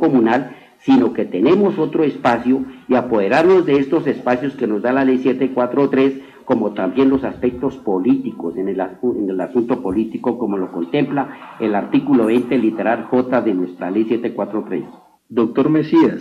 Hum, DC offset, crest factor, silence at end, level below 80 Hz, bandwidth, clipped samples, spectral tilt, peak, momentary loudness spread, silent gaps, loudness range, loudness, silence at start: none; under 0.1%; 14 dB; 0 s; -54 dBFS; 7.2 kHz; under 0.1%; -8 dB/octave; -4 dBFS; 8 LU; none; 4 LU; -17 LUFS; 0 s